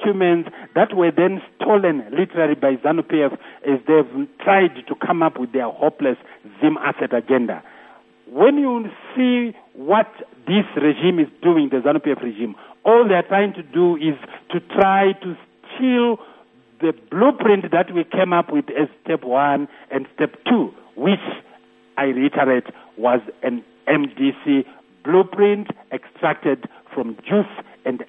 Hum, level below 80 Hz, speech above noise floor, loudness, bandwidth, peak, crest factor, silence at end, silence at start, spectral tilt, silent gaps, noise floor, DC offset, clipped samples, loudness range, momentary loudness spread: none; -70 dBFS; 29 dB; -19 LUFS; 3.9 kHz; 0 dBFS; 18 dB; 0.05 s; 0 s; -9.5 dB/octave; none; -47 dBFS; under 0.1%; under 0.1%; 3 LU; 12 LU